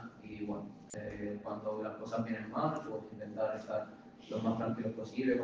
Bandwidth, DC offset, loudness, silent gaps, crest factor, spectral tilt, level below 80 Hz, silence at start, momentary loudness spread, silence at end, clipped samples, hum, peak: 9.6 kHz; under 0.1%; -39 LUFS; none; 18 dB; -7 dB/octave; -68 dBFS; 0 s; 10 LU; 0 s; under 0.1%; none; -22 dBFS